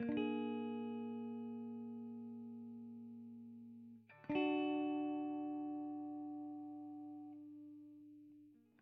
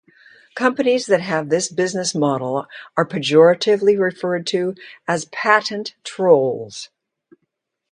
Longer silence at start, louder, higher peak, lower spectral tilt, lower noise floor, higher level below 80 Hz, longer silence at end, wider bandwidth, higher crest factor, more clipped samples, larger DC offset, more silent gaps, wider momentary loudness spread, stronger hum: second, 0 s vs 0.55 s; second, -45 LUFS vs -18 LUFS; second, -26 dBFS vs 0 dBFS; about the same, -4.5 dB/octave vs -4.5 dB/octave; second, -65 dBFS vs -75 dBFS; second, -84 dBFS vs -68 dBFS; second, 0.25 s vs 1.05 s; second, 4 kHz vs 10.5 kHz; about the same, 20 dB vs 18 dB; neither; neither; neither; first, 19 LU vs 14 LU; neither